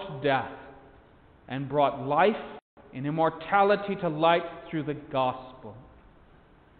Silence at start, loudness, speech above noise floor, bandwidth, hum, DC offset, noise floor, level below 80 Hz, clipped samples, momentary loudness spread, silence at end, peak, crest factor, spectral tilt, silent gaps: 0 s; -27 LUFS; 30 dB; 4.6 kHz; none; under 0.1%; -56 dBFS; -60 dBFS; under 0.1%; 20 LU; 0.95 s; -8 dBFS; 20 dB; -10 dB/octave; 2.62-2.77 s